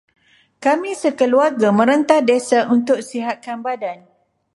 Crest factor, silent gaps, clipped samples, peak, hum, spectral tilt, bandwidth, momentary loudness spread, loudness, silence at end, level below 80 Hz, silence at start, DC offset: 16 dB; none; under 0.1%; -2 dBFS; none; -5 dB/octave; 11.5 kHz; 11 LU; -17 LUFS; 0.6 s; -70 dBFS; 0.6 s; under 0.1%